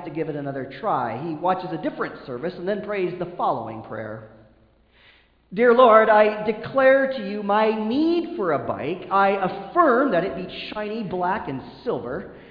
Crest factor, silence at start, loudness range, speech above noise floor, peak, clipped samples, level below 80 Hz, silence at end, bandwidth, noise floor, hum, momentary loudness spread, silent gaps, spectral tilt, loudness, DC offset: 22 dB; 0 s; 10 LU; 35 dB; 0 dBFS; under 0.1%; -58 dBFS; 0 s; 5.2 kHz; -57 dBFS; none; 14 LU; none; -9 dB/octave; -22 LUFS; under 0.1%